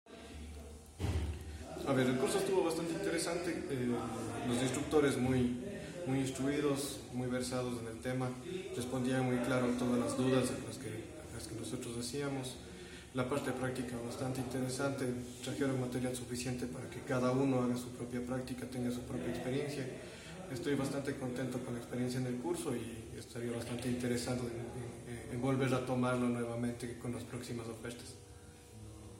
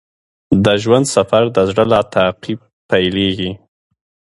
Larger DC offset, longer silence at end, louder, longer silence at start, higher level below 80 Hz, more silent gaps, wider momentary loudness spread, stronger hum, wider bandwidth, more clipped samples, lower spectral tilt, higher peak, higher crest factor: neither; second, 0 s vs 0.8 s; second, -38 LUFS vs -14 LUFS; second, 0.05 s vs 0.5 s; second, -56 dBFS vs -42 dBFS; second, none vs 2.73-2.89 s; about the same, 13 LU vs 12 LU; neither; first, 16.5 kHz vs 11.5 kHz; neither; about the same, -5.5 dB/octave vs -5 dB/octave; second, -18 dBFS vs 0 dBFS; about the same, 18 dB vs 16 dB